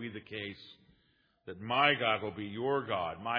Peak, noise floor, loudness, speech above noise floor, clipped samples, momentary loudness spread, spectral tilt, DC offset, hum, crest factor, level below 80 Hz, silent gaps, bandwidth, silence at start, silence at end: -12 dBFS; -72 dBFS; -32 LUFS; 38 dB; under 0.1%; 21 LU; -7.5 dB/octave; under 0.1%; none; 24 dB; -72 dBFS; none; 5.2 kHz; 0 s; 0 s